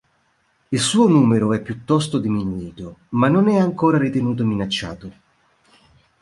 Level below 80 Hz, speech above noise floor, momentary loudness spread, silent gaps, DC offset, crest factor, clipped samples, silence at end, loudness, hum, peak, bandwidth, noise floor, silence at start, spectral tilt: -50 dBFS; 45 dB; 14 LU; none; under 0.1%; 16 dB; under 0.1%; 1.1 s; -19 LUFS; none; -4 dBFS; 11.5 kHz; -64 dBFS; 0.7 s; -6 dB/octave